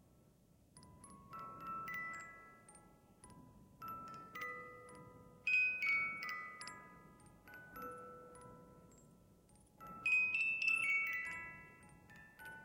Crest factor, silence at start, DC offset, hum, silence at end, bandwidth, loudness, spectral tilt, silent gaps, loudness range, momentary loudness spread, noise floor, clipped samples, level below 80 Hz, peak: 18 dB; 0.75 s; under 0.1%; none; 0 s; 16.5 kHz; -38 LUFS; -2.5 dB/octave; none; 15 LU; 26 LU; -69 dBFS; under 0.1%; -74 dBFS; -26 dBFS